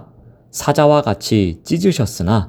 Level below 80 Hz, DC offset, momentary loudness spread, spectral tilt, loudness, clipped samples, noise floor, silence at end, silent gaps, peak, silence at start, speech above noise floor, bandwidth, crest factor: -44 dBFS; under 0.1%; 7 LU; -6 dB/octave; -16 LUFS; under 0.1%; -45 dBFS; 0 s; none; 0 dBFS; 0.55 s; 30 dB; over 20 kHz; 16 dB